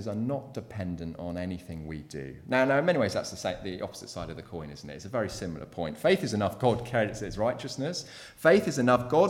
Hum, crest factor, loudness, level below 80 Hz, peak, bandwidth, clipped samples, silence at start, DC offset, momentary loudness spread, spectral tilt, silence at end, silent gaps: none; 20 dB; -29 LUFS; -54 dBFS; -8 dBFS; 17 kHz; under 0.1%; 0 s; under 0.1%; 16 LU; -5.5 dB/octave; 0 s; none